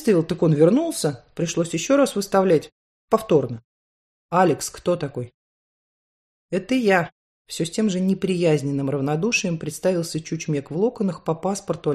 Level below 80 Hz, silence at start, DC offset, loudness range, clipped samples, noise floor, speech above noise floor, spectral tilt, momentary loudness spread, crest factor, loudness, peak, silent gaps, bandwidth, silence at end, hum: -58 dBFS; 0 s; under 0.1%; 5 LU; under 0.1%; under -90 dBFS; over 69 dB; -5.5 dB/octave; 10 LU; 18 dB; -22 LUFS; -4 dBFS; 2.72-3.08 s, 3.64-4.29 s, 5.34-6.49 s, 7.12-7.45 s; 13.5 kHz; 0 s; none